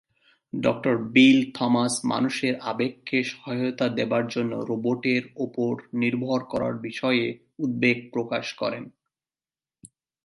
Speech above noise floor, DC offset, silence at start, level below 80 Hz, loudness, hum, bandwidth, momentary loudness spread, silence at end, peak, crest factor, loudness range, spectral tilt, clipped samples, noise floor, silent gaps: over 66 dB; under 0.1%; 0.55 s; -66 dBFS; -25 LUFS; none; 11.5 kHz; 9 LU; 0.4 s; -4 dBFS; 20 dB; 5 LU; -5 dB/octave; under 0.1%; under -90 dBFS; none